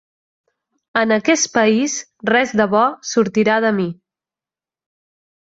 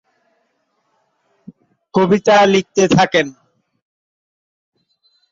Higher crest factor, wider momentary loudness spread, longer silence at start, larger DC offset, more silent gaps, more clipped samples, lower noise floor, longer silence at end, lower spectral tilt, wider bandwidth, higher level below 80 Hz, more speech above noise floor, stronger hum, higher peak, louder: about the same, 18 dB vs 16 dB; about the same, 7 LU vs 8 LU; second, 0.95 s vs 1.95 s; neither; neither; neither; first, under -90 dBFS vs -66 dBFS; second, 1.65 s vs 2 s; second, -3.5 dB/octave vs -5 dB/octave; about the same, 7.8 kHz vs 7.8 kHz; second, -62 dBFS vs -56 dBFS; first, over 74 dB vs 54 dB; neither; about the same, -2 dBFS vs -2 dBFS; second, -17 LUFS vs -14 LUFS